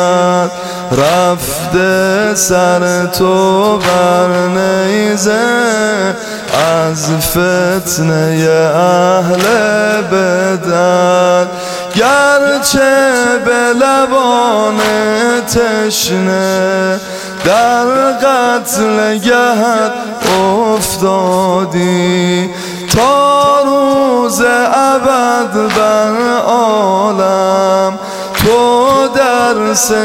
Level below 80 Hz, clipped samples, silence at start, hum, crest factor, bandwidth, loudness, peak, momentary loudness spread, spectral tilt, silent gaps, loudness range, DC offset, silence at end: -42 dBFS; under 0.1%; 0 s; none; 10 dB; 17 kHz; -10 LUFS; 0 dBFS; 4 LU; -4 dB/octave; none; 2 LU; under 0.1%; 0 s